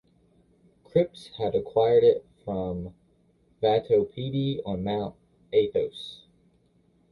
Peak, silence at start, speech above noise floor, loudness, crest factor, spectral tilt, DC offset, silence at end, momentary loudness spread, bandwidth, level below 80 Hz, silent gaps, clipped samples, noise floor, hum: -10 dBFS; 0.95 s; 39 dB; -26 LUFS; 18 dB; -8 dB/octave; under 0.1%; 0.95 s; 14 LU; 10.5 kHz; -56 dBFS; none; under 0.1%; -64 dBFS; none